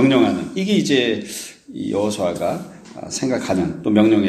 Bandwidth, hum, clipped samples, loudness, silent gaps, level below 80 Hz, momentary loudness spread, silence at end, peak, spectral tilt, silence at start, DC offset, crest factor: 14 kHz; none; under 0.1%; -20 LUFS; none; -54 dBFS; 14 LU; 0 s; 0 dBFS; -5 dB/octave; 0 s; under 0.1%; 18 dB